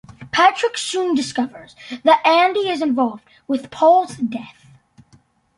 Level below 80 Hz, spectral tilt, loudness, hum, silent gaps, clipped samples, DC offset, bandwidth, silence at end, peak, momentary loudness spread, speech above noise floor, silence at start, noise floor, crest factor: -62 dBFS; -3.5 dB/octave; -18 LUFS; none; none; under 0.1%; under 0.1%; 11.5 kHz; 1.1 s; -2 dBFS; 13 LU; 37 dB; 0.2 s; -55 dBFS; 18 dB